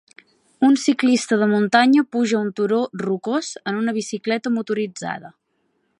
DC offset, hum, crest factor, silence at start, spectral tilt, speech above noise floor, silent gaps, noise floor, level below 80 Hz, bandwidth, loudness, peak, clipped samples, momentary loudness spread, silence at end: under 0.1%; none; 20 dB; 0.6 s; -4.5 dB/octave; 49 dB; none; -69 dBFS; -72 dBFS; 11 kHz; -20 LUFS; -2 dBFS; under 0.1%; 9 LU; 0.7 s